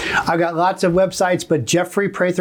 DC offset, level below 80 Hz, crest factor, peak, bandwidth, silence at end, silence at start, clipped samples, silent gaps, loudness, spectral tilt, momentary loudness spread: under 0.1%; -50 dBFS; 12 dB; -6 dBFS; over 20 kHz; 0 s; 0 s; under 0.1%; none; -18 LUFS; -4.5 dB/octave; 2 LU